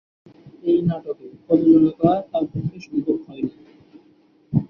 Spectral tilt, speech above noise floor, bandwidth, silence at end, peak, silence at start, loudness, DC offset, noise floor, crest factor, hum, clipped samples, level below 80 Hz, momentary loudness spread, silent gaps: -10.5 dB/octave; 36 dB; 5.8 kHz; 0.05 s; -4 dBFS; 0.45 s; -21 LUFS; under 0.1%; -56 dBFS; 18 dB; none; under 0.1%; -54 dBFS; 15 LU; none